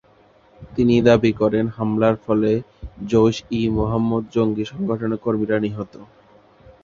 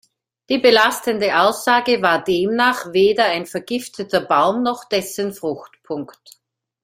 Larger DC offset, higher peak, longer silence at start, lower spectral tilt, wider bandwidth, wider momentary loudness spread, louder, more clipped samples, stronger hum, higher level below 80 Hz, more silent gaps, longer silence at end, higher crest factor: neither; about the same, -2 dBFS vs 0 dBFS; about the same, 0.6 s vs 0.5 s; first, -7.5 dB/octave vs -3.5 dB/octave; second, 7.2 kHz vs 16 kHz; second, 10 LU vs 13 LU; about the same, -20 LUFS vs -18 LUFS; neither; neither; first, -44 dBFS vs -62 dBFS; neither; about the same, 0.8 s vs 0.8 s; about the same, 18 dB vs 18 dB